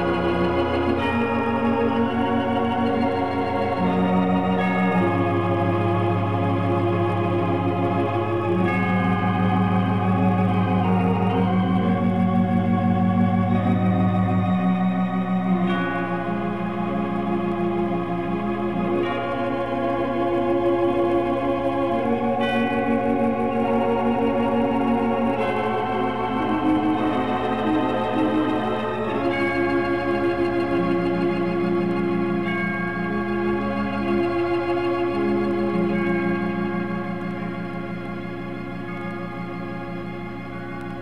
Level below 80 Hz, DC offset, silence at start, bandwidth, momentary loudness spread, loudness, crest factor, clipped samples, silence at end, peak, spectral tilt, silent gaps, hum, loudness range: -48 dBFS; 0.9%; 0 s; 6 kHz; 6 LU; -22 LUFS; 14 dB; under 0.1%; 0 s; -8 dBFS; -8.5 dB/octave; none; 60 Hz at -40 dBFS; 4 LU